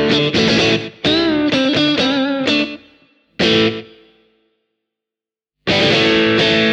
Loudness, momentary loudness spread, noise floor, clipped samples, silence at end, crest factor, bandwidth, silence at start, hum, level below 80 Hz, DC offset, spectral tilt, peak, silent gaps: -14 LUFS; 6 LU; -88 dBFS; under 0.1%; 0 s; 16 dB; 9.6 kHz; 0 s; none; -46 dBFS; under 0.1%; -4.5 dB/octave; -2 dBFS; none